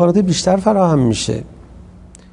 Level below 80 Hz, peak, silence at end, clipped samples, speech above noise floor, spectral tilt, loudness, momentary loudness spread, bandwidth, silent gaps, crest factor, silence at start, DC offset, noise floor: -40 dBFS; 0 dBFS; 0.8 s; under 0.1%; 26 dB; -6 dB/octave; -15 LUFS; 8 LU; 11 kHz; none; 16 dB; 0 s; under 0.1%; -40 dBFS